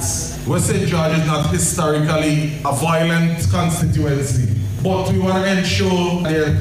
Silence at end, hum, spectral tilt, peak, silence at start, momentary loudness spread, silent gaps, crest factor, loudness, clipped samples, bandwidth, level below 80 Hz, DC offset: 0 s; none; -5 dB/octave; -4 dBFS; 0 s; 3 LU; none; 14 dB; -17 LUFS; under 0.1%; 16 kHz; -36 dBFS; under 0.1%